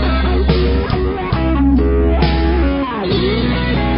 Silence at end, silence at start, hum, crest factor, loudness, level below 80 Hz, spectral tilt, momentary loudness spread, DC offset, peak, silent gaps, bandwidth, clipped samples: 0 s; 0 s; none; 12 dB; -15 LUFS; -18 dBFS; -12 dB/octave; 4 LU; under 0.1%; -2 dBFS; none; 5.6 kHz; under 0.1%